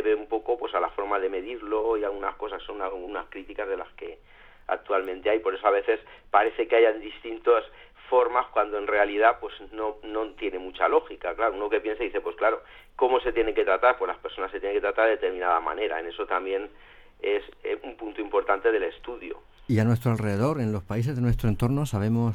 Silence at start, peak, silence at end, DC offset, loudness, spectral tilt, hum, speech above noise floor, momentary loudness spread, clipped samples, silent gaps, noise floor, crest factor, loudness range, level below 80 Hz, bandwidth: 0 s; -6 dBFS; 0 s; under 0.1%; -26 LUFS; -7.5 dB/octave; none; 26 dB; 12 LU; under 0.1%; none; -52 dBFS; 20 dB; 5 LU; -48 dBFS; 15 kHz